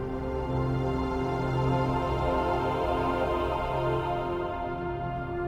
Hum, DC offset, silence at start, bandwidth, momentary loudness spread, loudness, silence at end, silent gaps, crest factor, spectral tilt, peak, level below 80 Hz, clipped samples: none; under 0.1%; 0 s; 11 kHz; 6 LU; -29 LUFS; 0 s; none; 14 dB; -8 dB/octave; -14 dBFS; -40 dBFS; under 0.1%